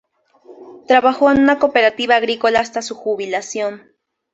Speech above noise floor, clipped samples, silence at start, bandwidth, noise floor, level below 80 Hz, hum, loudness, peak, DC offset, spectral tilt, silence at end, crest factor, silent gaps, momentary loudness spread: 31 dB; under 0.1%; 0.5 s; 8 kHz; -46 dBFS; -54 dBFS; none; -16 LUFS; -2 dBFS; under 0.1%; -3.5 dB/octave; 0.55 s; 16 dB; none; 11 LU